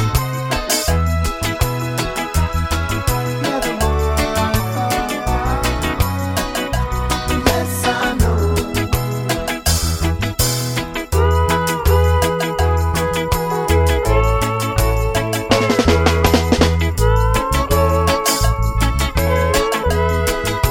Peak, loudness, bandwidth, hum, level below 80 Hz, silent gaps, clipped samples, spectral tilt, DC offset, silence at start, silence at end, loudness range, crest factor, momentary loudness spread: 0 dBFS; -17 LUFS; 17 kHz; none; -22 dBFS; none; under 0.1%; -4.5 dB/octave; under 0.1%; 0 s; 0 s; 3 LU; 16 dB; 5 LU